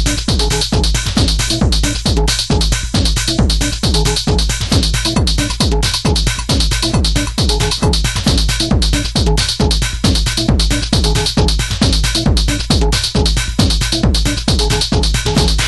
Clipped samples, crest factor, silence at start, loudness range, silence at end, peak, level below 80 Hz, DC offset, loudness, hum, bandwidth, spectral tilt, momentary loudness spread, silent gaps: under 0.1%; 14 dB; 0 s; 0 LU; 0 s; 0 dBFS; -18 dBFS; under 0.1%; -14 LUFS; none; 12.5 kHz; -4 dB/octave; 1 LU; none